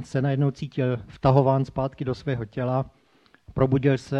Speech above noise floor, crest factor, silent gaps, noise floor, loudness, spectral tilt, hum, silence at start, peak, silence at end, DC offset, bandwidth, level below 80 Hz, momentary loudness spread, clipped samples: 36 dB; 20 dB; none; -60 dBFS; -24 LUFS; -8.5 dB/octave; none; 0 s; -4 dBFS; 0 s; under 0.1%; 8.4 kHz; -48 dBFS; 9 LU; under 0.1%